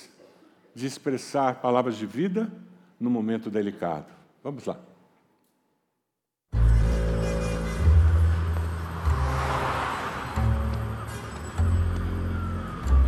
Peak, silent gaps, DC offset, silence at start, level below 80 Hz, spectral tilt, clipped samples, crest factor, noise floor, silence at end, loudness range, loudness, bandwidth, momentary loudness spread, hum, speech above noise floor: -8 dBFS; none; under 0.1%; 0 s; -30 dBFS; -7 dB/octave; under 0.1%; 16 dB; -83 dBFS; 0 s; 7 LU; -27 LUFS; 13 kHz; 12 LU; none; 55 dB